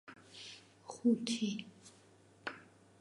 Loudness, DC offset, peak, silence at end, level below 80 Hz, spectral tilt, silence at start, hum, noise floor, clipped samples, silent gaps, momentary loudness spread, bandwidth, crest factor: -37 LUFS; under 0.1%; -20 dBFS; 0.35 s; -84 dBFS; -4.5 dB/octave; 0.05 s; none; -64 dBFS; under 0.1%; none; 22 LU; 11.5 kHz; 20 dB